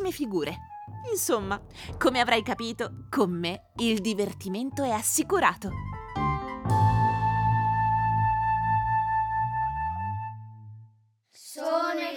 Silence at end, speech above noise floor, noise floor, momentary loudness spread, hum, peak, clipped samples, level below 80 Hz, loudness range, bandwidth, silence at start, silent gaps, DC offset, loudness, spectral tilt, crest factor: 0 s; 34 dB; -61 dBFS; 12 LU; none; -8 dBFS; under 0.1%; -46 dBFS; 3 LU; 20 kHz; 0 s; none; under 0.1%; -27 LUFS; -4.5 dB/octave; 20 dB